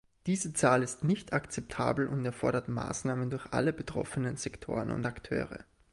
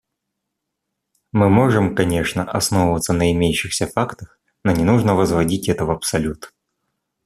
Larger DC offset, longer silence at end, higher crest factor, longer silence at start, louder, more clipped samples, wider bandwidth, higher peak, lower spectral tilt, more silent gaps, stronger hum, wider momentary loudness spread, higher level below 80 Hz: neither; second, 0.3 s vs 0.8 s; about the same, 20 dB vs 18 dB; second, 0.25 s vs 1.35 s; second, -33 LUFS vs -18 LUFS; neither; second, 11.5 kHz vs 14.5 kHz; second, -12 dBFS vs 0 dBFS; about the same, -5.5 dB/octave vs -5.5 dB/octave; neither; neither; about the same, 8 LU vs 8 LU; second, -56 dBFS vs -42 dBFS